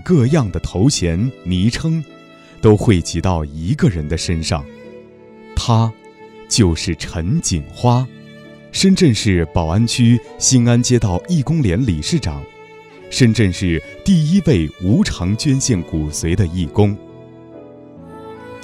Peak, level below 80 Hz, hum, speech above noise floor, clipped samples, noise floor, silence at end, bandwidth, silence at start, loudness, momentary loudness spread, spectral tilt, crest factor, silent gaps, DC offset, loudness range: 0 dBFS; -32 dBFS; none; 26 dB; under 0.1%; -41 dBFS; 0 s; 13 kHz; 0 s; -16 LUFS; 10 LU; -5.5 dB/octave; 16 dB; none; under 0.1%; 5 LU